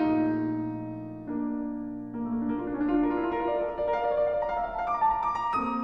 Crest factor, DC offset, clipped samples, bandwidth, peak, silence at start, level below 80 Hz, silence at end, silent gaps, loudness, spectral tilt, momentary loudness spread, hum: 14 dB; under 0.1%; under 0.1%; 6.2 kHz; -14 dBFS; 0 s; -52 dBFS; 0 s; none; -29 LUFS; -8.5 dB/octave; 9 LU; none